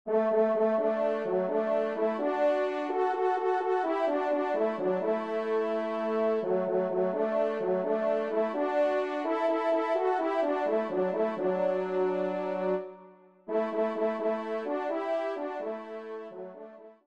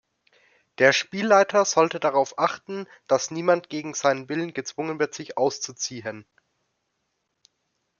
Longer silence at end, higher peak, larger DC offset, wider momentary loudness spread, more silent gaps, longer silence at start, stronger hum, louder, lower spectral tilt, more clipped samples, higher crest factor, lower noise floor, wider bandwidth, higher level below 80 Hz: second, 0.15 s vs 1.8 s; second, -16 dBFS vs -4 dBFS; neither; second, 7 LU vs 13 LU; neither; second, 0.05 s vs 0.8 s; neither; second, -29 LUFS vs -23 LUFS; first, -7.5 dB/octave vs -3 dB/octave; neither; second, 14 dB vs 22 dB; second, -54 dBFS vs -76 dBFS; first, 8.2 kHz vs 7.4 kHz; about the same, -80 dBFS vs -76 dBFS